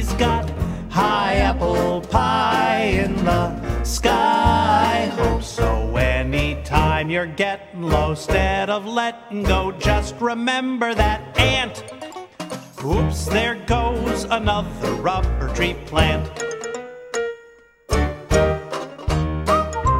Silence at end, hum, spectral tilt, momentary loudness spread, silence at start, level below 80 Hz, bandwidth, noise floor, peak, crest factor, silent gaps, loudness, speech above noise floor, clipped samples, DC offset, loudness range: 0 s; none; -5 dB/octave; 10 LU; 0 s; -28 dBFS; 16 kHz; -48 dBFS; -2 dBFS; 18 dB; none; -20 LUFS; 29 dB; under 0.1%; under 0.1%; 4 LU